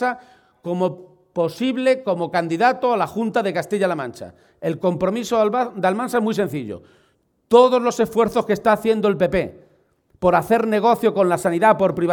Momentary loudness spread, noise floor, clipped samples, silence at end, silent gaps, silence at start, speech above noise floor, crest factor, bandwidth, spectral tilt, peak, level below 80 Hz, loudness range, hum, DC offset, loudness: 12 LU; -63 dBFS; under 0.1%; 0 s; none; 0 s; 44 dB; 18 dB; 19 kHz; -6 dB/octave; 0 dBFS; -54 dBFS; 3 LU; none; under 0.1%; -19 LUFS